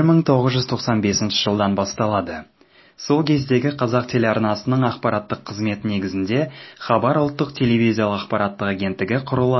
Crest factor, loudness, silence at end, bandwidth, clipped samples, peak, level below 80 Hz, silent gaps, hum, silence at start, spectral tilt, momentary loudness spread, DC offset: 18 dB; -20 LUFS; 0 s; 6.2 kHz; under 0.1%; -2 dBFS; -50 dBFS; none; none; 0 s; -6 dB/octave; 6 LU; under 0.1%